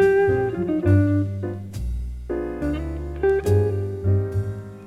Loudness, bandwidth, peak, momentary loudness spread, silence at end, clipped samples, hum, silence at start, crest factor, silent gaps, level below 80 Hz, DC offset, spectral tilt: -23 LUFS; 11.5 kHz; -6 dBFS; 12 LU; 0 s; under 0.1%; none; 0 s; 16 dB; none; -34 dBFS; under 0.1%; -9 dB/octave